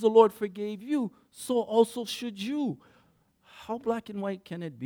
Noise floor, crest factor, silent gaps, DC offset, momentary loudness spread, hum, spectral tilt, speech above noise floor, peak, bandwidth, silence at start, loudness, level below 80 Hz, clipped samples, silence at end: -65 dBFS; 22 dB; none; under 0.1%; 14 LU; none; -5.5 dB/octave; 38 dB; -6 dBFS; 18 kHz; 0 s; -29 LUFS; -74 dBFS; under 0.1%; 0 s